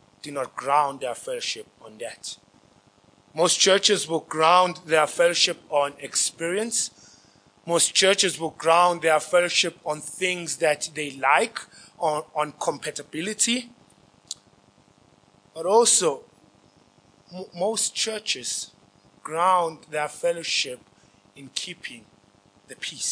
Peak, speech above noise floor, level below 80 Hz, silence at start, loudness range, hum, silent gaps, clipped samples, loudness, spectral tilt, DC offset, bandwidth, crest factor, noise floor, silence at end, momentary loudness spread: -4 dBFS; 34 dB; -74 dBFS; 0.25 s; 8 LU; none; none; under 0.1%; -23 LUFS; -1.5 dB/octave; under 0.1%; 10.5 kHz; 22 dB; -58 dBFS; 0 s; 19 LU